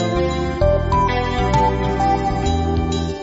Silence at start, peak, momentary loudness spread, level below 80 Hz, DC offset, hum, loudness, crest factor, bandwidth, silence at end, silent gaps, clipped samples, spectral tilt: 0 s; -4 dBFS; 3 LU; -26 dBFS; 0.1%; none; -19 LUFS; 14 dB; 8 kHz; 0 s; none; under 0.1%; -6.5 dB/octave